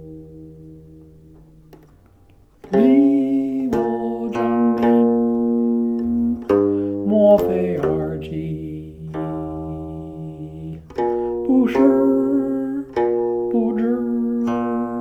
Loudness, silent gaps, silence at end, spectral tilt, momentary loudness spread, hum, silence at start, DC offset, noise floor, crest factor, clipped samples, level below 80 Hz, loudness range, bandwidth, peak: -19 LUFS; none; 0 s; -9 dB/octave; 17 LU; none; 0 s; under 0.1%; -51 dBFS; 16 dB; under 0.1%; -46 dBFS; 7 LU; 13 kHz; -4 dBFS